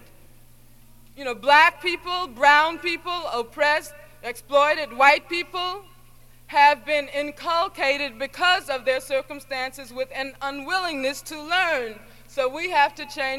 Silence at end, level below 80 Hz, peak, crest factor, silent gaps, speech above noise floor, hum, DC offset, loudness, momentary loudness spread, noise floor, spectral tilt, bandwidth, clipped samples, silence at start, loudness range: 0 s; -54 dBFS; -2 dBFS; 20 dB; none; 26 dB; 60 Hz at -65 dBFS; under 0.1%; -22 LUFS; 15 LU; -49 dBFS; -2 dB/octave; 16.5 kHz; under 0.1%; 1.15 s; 6 LU